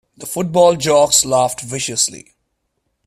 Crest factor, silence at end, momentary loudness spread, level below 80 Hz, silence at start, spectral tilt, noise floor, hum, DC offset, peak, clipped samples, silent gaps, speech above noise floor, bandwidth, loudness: 16 dB; 0.9 s; 11 LU; -52 dBFS; 0.2 s; -3 dB/octave; -70 dBFS; none; under 0.1%; 0 dBFS; under 0.1%; none; 55 dB; 16 kHz; -15 LUFS